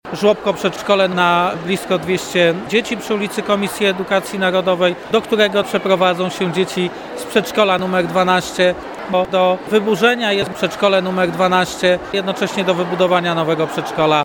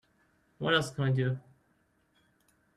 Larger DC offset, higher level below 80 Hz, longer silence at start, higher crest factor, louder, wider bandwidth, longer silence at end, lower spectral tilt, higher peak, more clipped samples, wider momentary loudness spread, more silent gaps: neither; first, -52 dBFS vs -66 dBFS; second, 0.05 s vs 0.6 s; second, 16 dB vs 22 dB; first, -16 LUFS vs -31 LUFS; first, 19 kHz vs 12.5 kHz; second, 0 s vs 1.35 s; about the same, -4.5 dB/octave vs -5.5 dB/octave; first, 0 dBFS vs -12 dBFS; neither; second, 5 LU vs 8 LU; neither